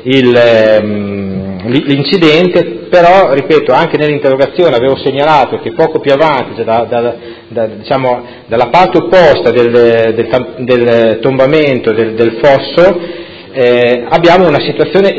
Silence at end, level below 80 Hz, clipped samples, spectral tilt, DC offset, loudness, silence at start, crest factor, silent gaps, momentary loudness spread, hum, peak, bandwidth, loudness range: 0 s; -42 dBFS; 1%; -7 dB/octave; under 0.1%; -9 LUFS; 0 s; 8 dB; none; 11 LU; none; 0 dBFS; 8 kHz; 3 LU